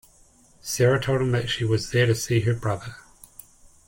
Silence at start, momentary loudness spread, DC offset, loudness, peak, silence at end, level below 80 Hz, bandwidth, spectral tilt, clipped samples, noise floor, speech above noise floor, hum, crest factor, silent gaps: 0.65 s; 11 LU; under 0.1%; -23 LUFS; -8 dBFS; 0.85 s; -50 dBFS; 17 kHz; -5 dB/octave; under 0.1%; -56 dBFS; 33 dB; none; 18 dB; none